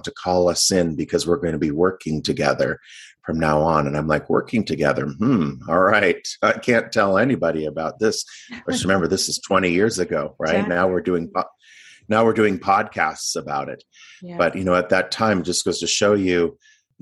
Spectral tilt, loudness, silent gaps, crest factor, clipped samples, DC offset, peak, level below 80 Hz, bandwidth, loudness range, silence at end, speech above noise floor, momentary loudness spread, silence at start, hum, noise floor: -4 dB/octave; -20 LUFS; none; 18 dB; under 0.1%; under 0.1%; -2 dBFS; -48 dBFS; 12.5 kHz; 2 LU; 0.5 s; 28 dB; 8 LU; 0.05 s; none; -48 dBFS